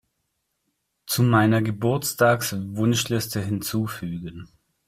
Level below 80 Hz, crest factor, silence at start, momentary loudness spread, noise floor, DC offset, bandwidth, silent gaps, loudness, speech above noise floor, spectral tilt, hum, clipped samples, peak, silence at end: -56 dBFS; 18 dB; 1.05 s; 12 LU; -76 dBFS; under 0.1%; 16 kHz; none; -23 LUFS; 53 dB; -5 dB/octave; none; under 0.1%; -6 dBFS; 0.45 s